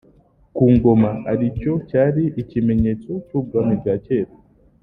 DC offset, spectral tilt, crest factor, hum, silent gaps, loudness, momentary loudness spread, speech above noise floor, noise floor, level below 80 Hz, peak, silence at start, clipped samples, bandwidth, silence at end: under 0.1%; -12 dB/octave; 16 dB; none; none; -19 LUFS; 10 LU; 36 dB; -53 dBFS; -40 dBFS; -2 dBFS; 0.55 s; under 0.1%; 3.9 kHz; 0.55 s